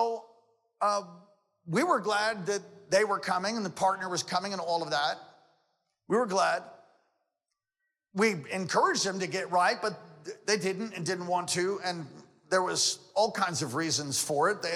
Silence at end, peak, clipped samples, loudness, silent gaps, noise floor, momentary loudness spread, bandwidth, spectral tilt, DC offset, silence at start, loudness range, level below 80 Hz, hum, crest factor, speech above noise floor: 0 s; -12 dBFS; under 0.1%; -29 LUFS; none; -87 dBFS; 8 LU; 16 kHz; -3 dB/octave; under 0.1%; 0 s; 3 LU; -78 dBFS; none; 18 dB; 57 dB